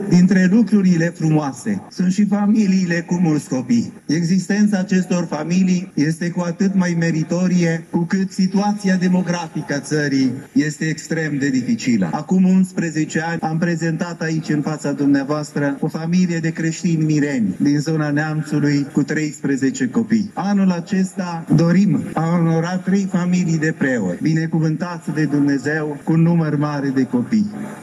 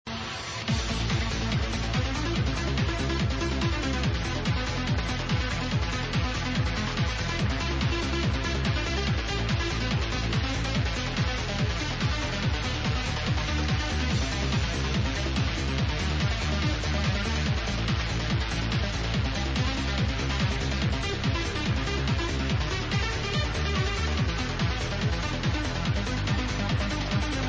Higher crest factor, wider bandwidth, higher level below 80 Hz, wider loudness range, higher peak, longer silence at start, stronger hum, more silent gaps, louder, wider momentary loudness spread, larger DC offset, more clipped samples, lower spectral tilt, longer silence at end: about the same, 14 dB vs 14 dB; first, 11.5 kHz vs 8 kHz; second, -60 dBFS vs -32 dBFS; about the same, 2 LU vs 1 LU; first, -4 dBFS vs -14 dBFS; about the same, 0 s vs 0.05 s; neither; neither; first, -18 LUFS vs -28 LUFS; first, 6 LU vs 1 LU; neither; neither; first, -6.5 dB/octave vs -5 dB/octave; about the same, 0 s vs 0 s